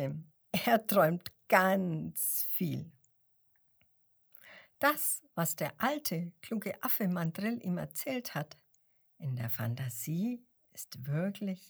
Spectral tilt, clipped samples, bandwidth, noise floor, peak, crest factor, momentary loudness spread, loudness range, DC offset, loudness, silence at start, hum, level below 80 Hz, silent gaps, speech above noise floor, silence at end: -5 dB/octave; under 0.1%; over 20 kHz; -72 dBFS; -10 dBFS; 26 dB; 16 LU; 7 LU; under 0.1%; -33 LUFS; 0 s; none; -76 dBFS; none; 38 dB; 0.05 s